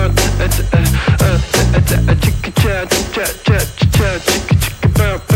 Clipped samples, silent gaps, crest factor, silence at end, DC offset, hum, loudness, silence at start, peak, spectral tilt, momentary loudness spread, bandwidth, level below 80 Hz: under 0.1%; none; 12 dB; 0 s; under 0.1%; none; -14 LUFS; 0 s; -2 dBFS; -5 dB/octave; 3 LU; 17 kHz; -20 dBFS